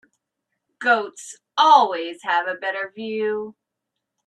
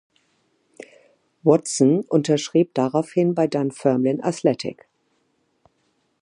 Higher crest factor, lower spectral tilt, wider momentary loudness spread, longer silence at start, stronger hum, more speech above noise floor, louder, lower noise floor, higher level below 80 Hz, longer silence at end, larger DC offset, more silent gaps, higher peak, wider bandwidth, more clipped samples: about the same, 22 dB vs 20 dB; second, -2.5 dB/octave vs -6 dB/octave; first, 16 LU vs 4 LU; second, 0.8 s vs 1.45 s; neither; first, 61 dB vs 48 dB; about the same, -20 LUFS vs -21 LUFS; first, -81 dBFS vs -68 dBFS; second, -80 dBFS vs -70 dBFS; second, 0.75 s vs 1.5 s; neither; neither; about the same, -2 dBFS vs -2 dBFS; about the same, 11 kHz vs 11.5 kHz; neither